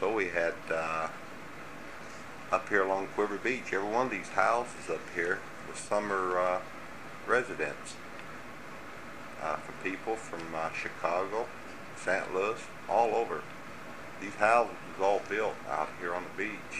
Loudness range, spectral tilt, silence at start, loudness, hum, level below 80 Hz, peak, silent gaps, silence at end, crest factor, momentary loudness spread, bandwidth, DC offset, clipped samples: 5 LU; -4 dB/octave; 0 s; -32 LUFS; none; -66 dBFS; -10 dBFS; none; 0 s; 22 dB; 16 LU; 15.5 kHz; 0.4%; under 0.1%